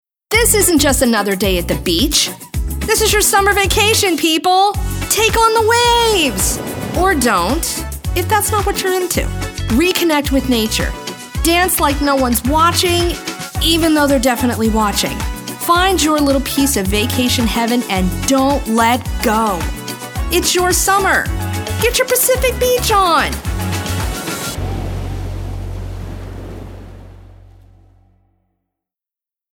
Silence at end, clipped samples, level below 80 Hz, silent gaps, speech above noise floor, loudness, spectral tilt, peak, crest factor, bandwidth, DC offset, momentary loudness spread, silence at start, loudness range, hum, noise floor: 2.2 s; under 0.1%; -26 dBFS; none; 73 dB; -14 LUFS; -3.5 dB/octave; 0 dBFS; 14 dB; over 20 kHz; under 0.1%; 12 LU; 0.3 s; 10 LU; none; -87 dBFS